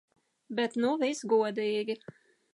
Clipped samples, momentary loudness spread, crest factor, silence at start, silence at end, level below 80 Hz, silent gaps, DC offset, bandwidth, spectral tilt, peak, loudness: under 0.1%; 10 LU; 16 dB; 0.5 s; 0.6 s; -82 dBFS; none; under 0.1%; 11.5 kHz; -4.5 dB/octave; -14 dBFS; -30 LUFS